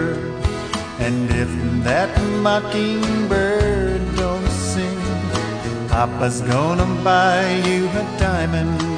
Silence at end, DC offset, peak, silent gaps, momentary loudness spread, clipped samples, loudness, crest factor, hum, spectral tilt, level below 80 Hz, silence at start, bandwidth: 0 s; 0.3%; -2 dBFS; none; 6 LU; under 0.1%; -19 LUFS; 16 dB; none; -5.5 dB/octave; -30 dBFS; 0 s; 10.5 kHz